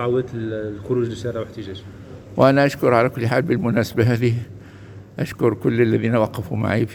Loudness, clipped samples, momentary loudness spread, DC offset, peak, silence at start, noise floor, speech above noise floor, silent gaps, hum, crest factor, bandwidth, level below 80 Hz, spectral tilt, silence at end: -20 LUFS; under 0.1%; 20 LU; under 0.1%; 0 dBFS; 0 s; -40 dBFS; 20 dB; none; none; 20 dB; 17 kHz; -50 dBFS; -7.5 dB/octave; 0 s